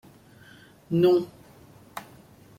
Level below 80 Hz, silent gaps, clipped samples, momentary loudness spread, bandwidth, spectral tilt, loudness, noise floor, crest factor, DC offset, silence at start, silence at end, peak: -64 dBFS; none; under 0.1%; 21 LU; 15.5 kHz; -8 dB/octave; -23 LUFS; -52 dBFS; 18 dB; under 0.1%; 0.9 s; 0.6 s; -10 dBFS